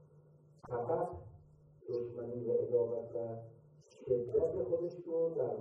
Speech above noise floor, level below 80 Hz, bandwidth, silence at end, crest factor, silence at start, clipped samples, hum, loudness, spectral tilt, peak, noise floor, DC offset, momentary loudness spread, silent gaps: 27 dB; -68 dBFS; 6.2 kHz; 0 s; 18 dB; 0.15 s; under 0.1%; none; -37 LUFS; -10 dB/octave; -20 dBFS; -63 dBFS; under 0.1%; 17 LU; none